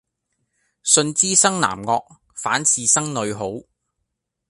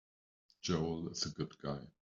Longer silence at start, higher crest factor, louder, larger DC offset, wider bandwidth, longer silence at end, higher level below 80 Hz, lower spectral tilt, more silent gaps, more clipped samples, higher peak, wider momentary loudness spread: first, 0.85 s vs 0.65 s; about the same, 22 dB vs 20 dB; first, -18 LUFS vs -40 LUFS; neither; first, 11.5 kHz vs 7.8 kHz; first, 0.9 s vs 0.3 s; first, -60 dBFS vs -66 dBFS; second, -2 dB/octave vs -5 dB/octave; neither; neither; first, 0 dBFS vs -22 dBFS; first, 15 LU vs 8 LU